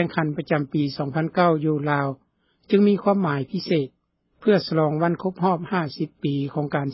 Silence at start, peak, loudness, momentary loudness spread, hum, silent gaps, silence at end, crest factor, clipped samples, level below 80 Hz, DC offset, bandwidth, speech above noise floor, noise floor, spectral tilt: 0 s; -4 dBFS; -23 LUFS; 7 LU; none; none; 0 s; 18 dB; under 0.1%; -62 dBFS; under 0.1%; 5.8 kHz; 33 dB; -55 dBFS; -11 dB/octave